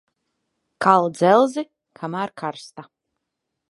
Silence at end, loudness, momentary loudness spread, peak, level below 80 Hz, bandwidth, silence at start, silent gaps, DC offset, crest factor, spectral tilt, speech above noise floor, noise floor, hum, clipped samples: 0.85 s; -20 LUFS; 20 LU; -2 dBFS; -74 dBFS; 11.5 kHz; 0.8 s; none; under 0.1%; 22 dB; -6 dB/octave; 61 dB; -80 dBFS; none; under 0.1%